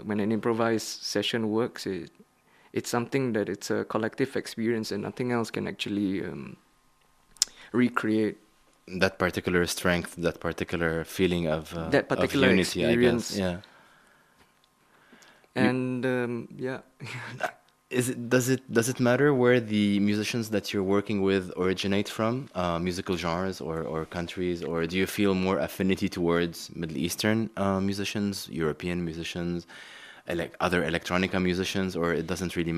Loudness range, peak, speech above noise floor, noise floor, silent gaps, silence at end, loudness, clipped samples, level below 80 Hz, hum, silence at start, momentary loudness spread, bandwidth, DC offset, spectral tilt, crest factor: 6 LU; 0 dBFS; 37 dB; -64 dBFS; none; 0 s; -28 LUFS; under 0.1%; -56 dBFS; none; 0 s; 10 LU; 14.5 kHz; under 0.1%; -5 dB/octave; 28 dB